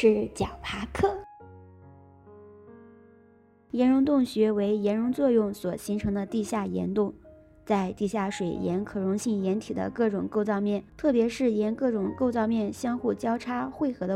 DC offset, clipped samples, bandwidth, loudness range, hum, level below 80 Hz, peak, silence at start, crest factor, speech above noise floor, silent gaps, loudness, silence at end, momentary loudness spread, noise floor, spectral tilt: under 0.1%; under 0.1%; 14 kHz; 5 LU; none; -54 dBFS; -10 dBFS; 0 s; 18 dB; 32 dB; none; -27 LUFS; 0 s; 8 LU; -58 dBFS; -6.5 dB/octave